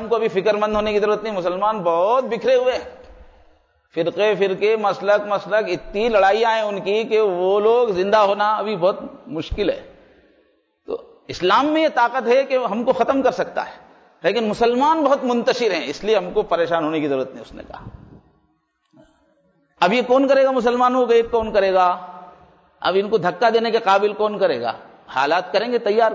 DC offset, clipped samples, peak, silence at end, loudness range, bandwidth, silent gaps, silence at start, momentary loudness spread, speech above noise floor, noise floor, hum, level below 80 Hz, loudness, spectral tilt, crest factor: under 0.1%; under 0.1%; -6 dBFS; 0 s; 5 LU; 8 kHz; none; 0 s; 12 LU; 48 dB; -66 dBFS; none; -48 dBFS; -19 LUFS; -5 dB/octave; 14 dB